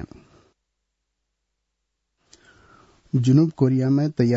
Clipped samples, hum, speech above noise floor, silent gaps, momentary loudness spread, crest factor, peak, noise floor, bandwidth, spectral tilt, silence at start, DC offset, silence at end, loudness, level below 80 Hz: under 0.1%; none; 60 dB; none; 8 LU; 16 dB; -8 dBFS; -78 dBFS; 8 kHz; -9 dB/octave; 0 s; under 0.1%; 0 s; -20 LUFS; -60 dBFS